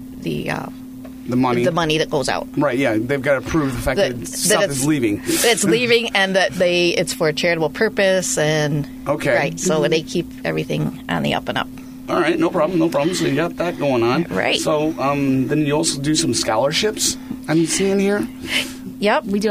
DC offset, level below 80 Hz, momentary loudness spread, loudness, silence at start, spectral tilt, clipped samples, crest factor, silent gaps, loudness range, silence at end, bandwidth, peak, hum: under 0.1%; -44 dBFS; 8 LU; -18 LUFS; 0 s; -4 dB/octave; under 0.1%; 16 dB; none; 4 LU; 0 s; 15.5 kHz; -2 dBFS; none